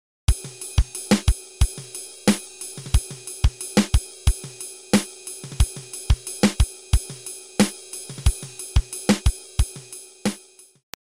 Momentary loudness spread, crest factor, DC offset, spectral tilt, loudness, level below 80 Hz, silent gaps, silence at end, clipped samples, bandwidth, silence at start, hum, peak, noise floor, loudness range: 13 LU; 20 dB; 0.1%; -4.5 dB/octave; -25 LUFS; -26 dBFS; none; 0.7 s; under 0.1%; 16 kHz; 0.3 s; none; -4 dBFS; -48 dBFS; 1 LU